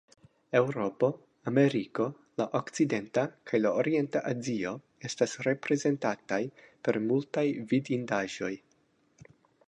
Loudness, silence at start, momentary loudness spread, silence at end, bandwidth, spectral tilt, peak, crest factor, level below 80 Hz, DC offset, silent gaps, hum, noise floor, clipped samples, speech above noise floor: -31 LUFS; 0.5 s; 8 LU; 1.1 s; 10 kHz; -6 dB/octave; -10 dBFS; 20 dB; -74 dBFS; under 0.1%; none; none; -69 dBFS; under 0.1%; 40 dB